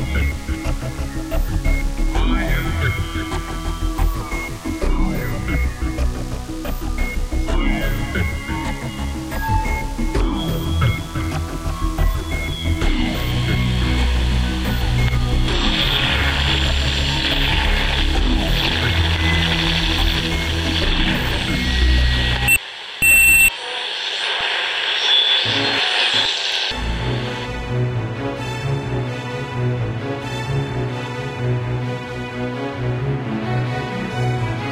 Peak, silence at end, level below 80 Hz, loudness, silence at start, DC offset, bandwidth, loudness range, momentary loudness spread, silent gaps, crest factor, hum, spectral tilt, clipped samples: -4 dBFS; 0 s; -24 dBFS; -19 LUFS; 0 s; under 0.1%; 15.5 kHz; 9 LU; 10 LU; none; 14 dB; none; -4 dB/octave; under 0.1%